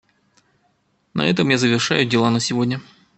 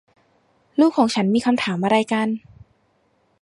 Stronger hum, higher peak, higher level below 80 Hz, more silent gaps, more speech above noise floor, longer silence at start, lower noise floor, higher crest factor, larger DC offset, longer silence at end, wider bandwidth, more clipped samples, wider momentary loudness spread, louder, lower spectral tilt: neither; about the same, -2 dBFS vs -4 dBFS; about the same, -60 dBFS vs -62 dBFS; neither; about the same, 46 dB vs 45 dB; first, 1.15 s vs 0.8 s; about the same, -65 dBFS vs -64 dBFS; about the same, 20 dB vs 18 dB; neither; second, 0.35 s vs 1.05 s; second, 8.8 kHz vs 11.5 kHz; neither; about the same, 8 LU vs 9 LU; about the same, -19 LUFS vs -20 LUFS; about the same, -4.5 dB/octave vs -5.5 dB/octave